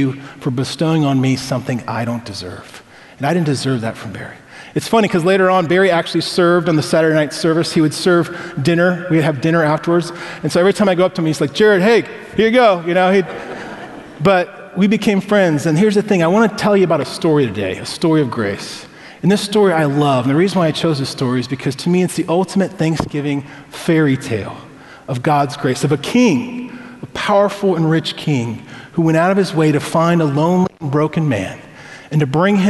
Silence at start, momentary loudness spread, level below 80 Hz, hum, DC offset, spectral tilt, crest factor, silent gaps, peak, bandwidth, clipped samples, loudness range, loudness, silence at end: 0 s; 13 LU; -52 dBFS; none; under 0.1%; -6 dB/octave; 16 dB; none; 0 dBFS; 12 kHz; under 0.1%; 4 LU; -15 LUFS; 0 s